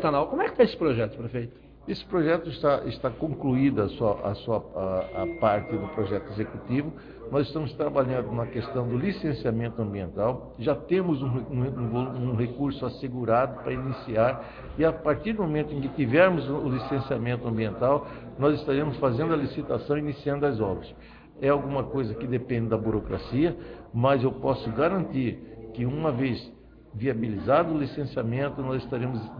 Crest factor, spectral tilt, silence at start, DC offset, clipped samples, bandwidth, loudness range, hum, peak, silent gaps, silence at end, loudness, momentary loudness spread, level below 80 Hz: 20 dB; -10 dB/octave; 0 s; under 0.1%; under 0.1%; 5.2 kHz; 3 LU; none; -8 dBFS; none; 0 s; -27 LUFS; 8 LU; -50 dBFS